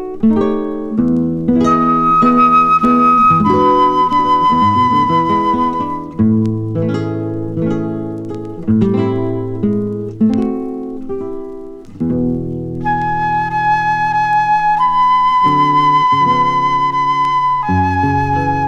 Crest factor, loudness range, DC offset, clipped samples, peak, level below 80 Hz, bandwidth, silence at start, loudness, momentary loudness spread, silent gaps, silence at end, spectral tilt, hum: 12 dB; 8 LU; under 0.1%; under 0.1%; 0 dBFS; -40 dBFS; 8 kHz; 0 s; -13 LUFS; 12 LU; none; 0 s; -7.5 dB/octave; none